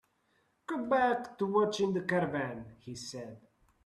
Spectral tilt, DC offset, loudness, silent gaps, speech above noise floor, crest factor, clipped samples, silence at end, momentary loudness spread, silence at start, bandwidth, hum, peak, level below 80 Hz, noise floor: -5.5 dB/octave; under 0.1%; -32 LUFS; none; 42 dB; 18 dB; under 0.1%; 0.5 s; 17 LU; 0.7 s; 12.5 kHz; none; -16 dBFS; -70 dBFS; -74 dBFS